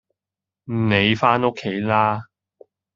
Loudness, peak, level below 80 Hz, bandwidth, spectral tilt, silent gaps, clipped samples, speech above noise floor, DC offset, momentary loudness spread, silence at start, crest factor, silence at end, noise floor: -20 LUFS; -2 dBFS; -58 dBFS; 7.4 kHz; -4 dB/octave; none; under 0.1%; 69 dB; under 0.1%; 10 LU; 0.7 s; 20 dB; 0.7 s; -88 dBFS